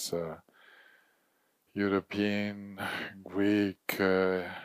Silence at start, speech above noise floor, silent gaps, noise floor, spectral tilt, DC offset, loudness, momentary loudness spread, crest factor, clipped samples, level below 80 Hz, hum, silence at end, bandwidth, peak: 0 s; 42 dB; none; -73 dBFS; -5 dB/octave; under 0.1%; -31 LUFS; 11 LU; 18 dB; under 0.1%; -74 dBFS; none; 0 s; 15.5 kHz; -14 dBFS